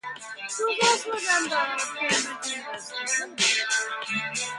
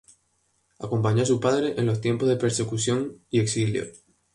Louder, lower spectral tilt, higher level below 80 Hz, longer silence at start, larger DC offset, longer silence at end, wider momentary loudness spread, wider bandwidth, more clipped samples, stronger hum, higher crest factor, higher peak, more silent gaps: about the same, -25 LUFS vs -24 LUFS; second, 0 dB/octave vs -5.5 dB/octave; second, -74 dBFS vs -58 dBFS; second, 0.05 s vs 0.8 s; neither; second, 0 s vs 0.35 s; first, 11 LU vs 7 LU; about the same, 11.5 kHz vs 11.5 kHz; neither; neither; about the same, 20 dB vs 16 dB; about the same, -8 dBFS vs -10 dBFS; neither